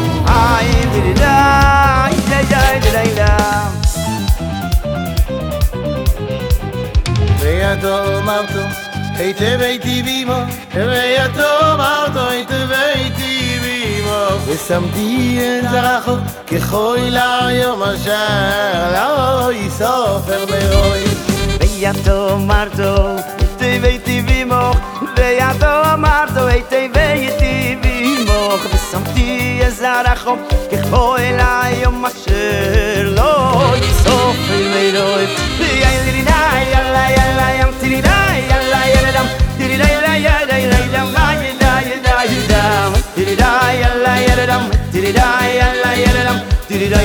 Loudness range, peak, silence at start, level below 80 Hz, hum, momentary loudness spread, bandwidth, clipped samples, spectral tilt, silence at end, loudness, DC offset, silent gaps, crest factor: 4 LU; 0 dBFS; 0 s; -20 dBFS; none; 6 LU; over 20 kHz; under 0.1%; -5 dB/octave; 0 s; -14 LUFS; under 0.1%; none; 12 dB